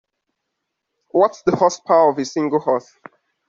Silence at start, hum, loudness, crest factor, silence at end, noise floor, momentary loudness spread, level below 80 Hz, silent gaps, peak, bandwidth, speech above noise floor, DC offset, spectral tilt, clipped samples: 1.15 s; none; -18 LUFS; 18 dB; 0.7 s; -77 dBFS; 7 LU; -64 dBFS; none; -2 dBFS; 7.6 kHz; 60 dB; under 0.1%; -5.5 dB/octave; under 0.1%